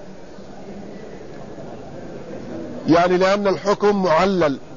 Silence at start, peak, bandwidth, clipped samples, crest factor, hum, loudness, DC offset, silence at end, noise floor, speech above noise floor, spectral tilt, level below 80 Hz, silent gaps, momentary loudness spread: 0 s; -4 dBFS; 7.4 kHz; under 0.1%; 16 dB; none; -17 LUFS; 1%; 0 s; -39 dBFS; 22 dB; -6 dB/octave; -48 dBFS; none; 21 LU